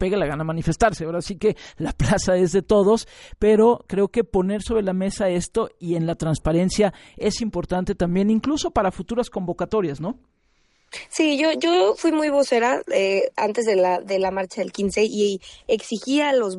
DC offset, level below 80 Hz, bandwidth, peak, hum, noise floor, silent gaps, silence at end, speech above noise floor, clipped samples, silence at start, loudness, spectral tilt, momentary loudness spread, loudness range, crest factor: under 0.1%; -40 dBFS; 11.5 kHz; -4 dBFS; none; -63 dBFS; none; 0 s; 42 dB; under 0.1%; 0 s; -22 LUFS; -5.5 dB/octave; 8 LU; 4 LU; 16 dB